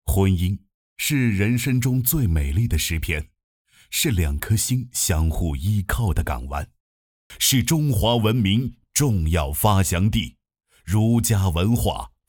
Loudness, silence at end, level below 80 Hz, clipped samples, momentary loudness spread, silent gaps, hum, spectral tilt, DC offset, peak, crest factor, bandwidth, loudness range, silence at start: -21 LUFS; 0.2 s; -32 dBFS; under 0.1%; 8 LU; 0.74-0.96 s, 3.44-3.65 s, 6.80-7.30 s; none; -5 dB/octave; under 0.1%; -4 dBFS; 18 dB; over 20 kHz; 3 LU; 0.05 s